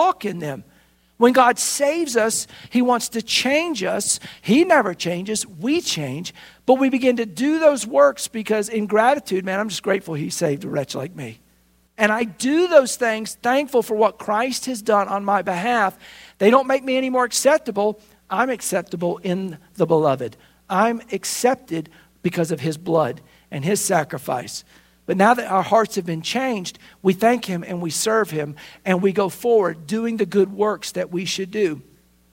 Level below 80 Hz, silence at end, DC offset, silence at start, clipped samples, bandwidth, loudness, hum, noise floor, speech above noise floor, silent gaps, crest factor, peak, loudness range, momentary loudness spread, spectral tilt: -62 dBFS; 0.5 s; under 0.1%; 0 s; under 0.1%; 16.5 kHz; -20 LUFS; none; -59 dBFS; 39 dB; none; 20 dB; 0 dBFS; 4 LU; 11 LU; -4 dB/octave